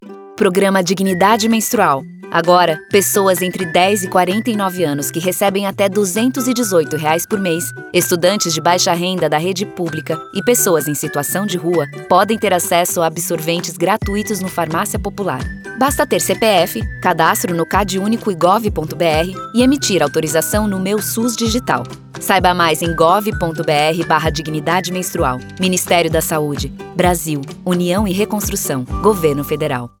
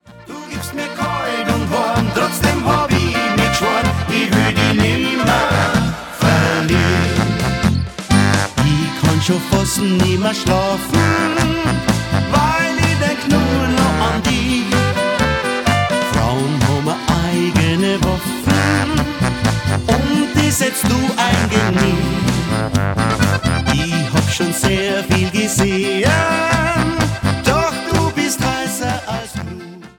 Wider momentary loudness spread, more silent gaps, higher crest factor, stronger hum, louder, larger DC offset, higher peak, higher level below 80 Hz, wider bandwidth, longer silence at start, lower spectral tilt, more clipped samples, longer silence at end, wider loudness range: first, 7 LU vs 4 LU; neither; about the same, 16 dB vs 16 dB; neither; about the same, -16 LUFS vs -16 LUFS; neither; about the same, 0 dBFS vs 0 dBFS; about the same, -36 dBFS vs -32 dBFS; about the same, over 20 kHz vs 19 kHz; about the same, 0 s vs 0.1 s; about the same, -4 dB/octave vs -5 dB/octave; neither; about the same, 0.1 s vs 0.1 s; about the same, 3 LU vs 1 LU